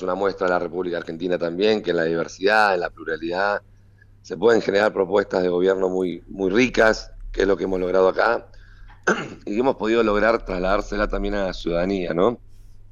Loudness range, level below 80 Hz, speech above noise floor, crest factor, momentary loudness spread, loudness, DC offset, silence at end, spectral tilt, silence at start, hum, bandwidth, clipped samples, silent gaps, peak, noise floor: 2 LU; -40 dBFS; 30 dB; 16 dB; 9 LU; -21 LUFS; under 0.1%; 0.1 s; -5.5 dB/octave; 0 s; none; 9 kHz; under 0.1%; none; -6 dBFS; -51 dBFS